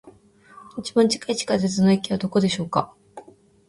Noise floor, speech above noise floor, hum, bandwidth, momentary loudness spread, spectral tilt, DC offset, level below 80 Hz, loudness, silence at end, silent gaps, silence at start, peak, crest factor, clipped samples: -50 dBFS; 29 dB; none; 11.5 kHz; 11 LU; -5.5 dB/octave; under 0.1%; -58 dBFS; -22 LUFS; 0.5 s; none; 0.05 s; -4 dBFS; 18 dB; under 0.1%